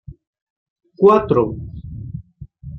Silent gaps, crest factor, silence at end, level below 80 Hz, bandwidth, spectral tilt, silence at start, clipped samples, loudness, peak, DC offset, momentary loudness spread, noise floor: 0.27-0.33 s, 0.42-0.76 s; 18 dB; 0 s; -44 dBFS; 6 kHz; -9.5 dB/octave; 0.1 s; under 0.1%; -15 LUFS; -2 dBFS; under 0.1%; 21 LU; -38 dBFS